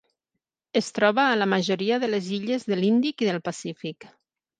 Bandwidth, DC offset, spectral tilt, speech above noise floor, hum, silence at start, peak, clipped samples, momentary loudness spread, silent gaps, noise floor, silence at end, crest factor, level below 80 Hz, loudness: 9.6 kHz; under 0.1%; -5 dB/octave; 60 dB; none; 0.75 s; -4 dBFS; under 0.1%; 12 LU; none; -84 dBFS; 0.55 s; 20 dB; -74 dBFS; -24 LUFS